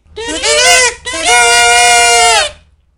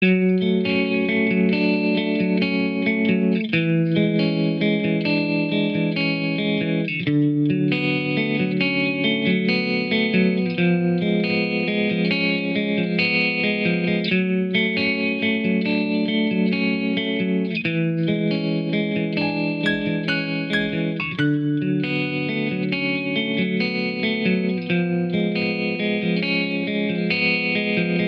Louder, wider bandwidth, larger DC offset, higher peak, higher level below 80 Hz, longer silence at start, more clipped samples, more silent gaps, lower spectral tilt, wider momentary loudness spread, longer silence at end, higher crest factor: first, -7 LUFS vs -21 LUFS; first, over 20 kHz vs 5.6 kHz; neither; first, 0 dBFS vs -8 dBFS; first, -36 dBFS vs -62 dBFS; first, 0.15 s vs 0 s; first, 0.8% vs under 0.1%; neither; second, 1 dB/octave vs -8.5 dB/octave; first, 9 LU vs 4 LU; first, 0.45 s vs 0 s; about the same, 10 dB vs 14 dB